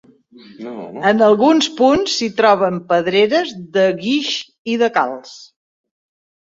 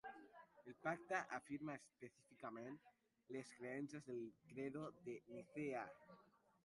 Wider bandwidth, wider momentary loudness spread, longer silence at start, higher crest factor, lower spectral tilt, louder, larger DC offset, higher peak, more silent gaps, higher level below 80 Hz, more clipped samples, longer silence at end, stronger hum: second, 7.8 kHz vs 11.5 kHz; second, 12 LU vs 17 LU; first, 0.6 s vs 0.05 s; second, 16 dB vs 22 dB; second, -4 dB/octave vs -6 dB/octave; first, -15 LUFS vs -51 LUFS; neither; first, -2 dBFS vs -30 dBFS; first, 4.59-4.65 s vs none; first, -56 dBFS vs -88 dBFS; neither; first, 1 s vs 0.4 s; neither